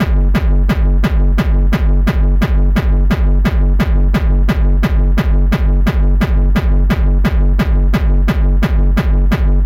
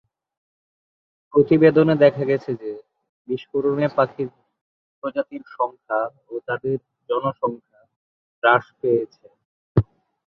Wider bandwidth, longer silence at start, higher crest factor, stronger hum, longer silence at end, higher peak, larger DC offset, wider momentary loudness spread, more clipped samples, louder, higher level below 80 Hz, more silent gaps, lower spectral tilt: about the same, 6.6 kHz vs 6 kHz; second, 0 s vs 1.35 s; second, 8 dB vs 20 dB; neither; second, 0 s vs 0.45 s; about the same, -2 dBFS vs -2 dBFS; neither; second, 0 LU vs 17 LU; neither; first, -14 LUFS vs -21 LUFS; first, -12 dBFS vs -52 dBFS; second, none vs 3.09-3.25 s, 4.61-5.02 s, 7.96-8.42 s, 9.45-9.75 s; second, -8 dB/octave vs -9.5 dB/octave